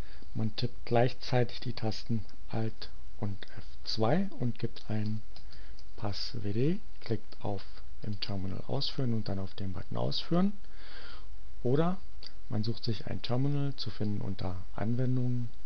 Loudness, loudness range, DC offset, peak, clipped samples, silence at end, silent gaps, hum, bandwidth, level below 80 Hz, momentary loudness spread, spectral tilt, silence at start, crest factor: -34 LUFS; 3 LU; 5%; -12 dBFS; under 0.1%; 0 s; none; none; 7 kHz; -52 dBFS; 18 LU; -7.5 dB/octave; 0 s; 20 dB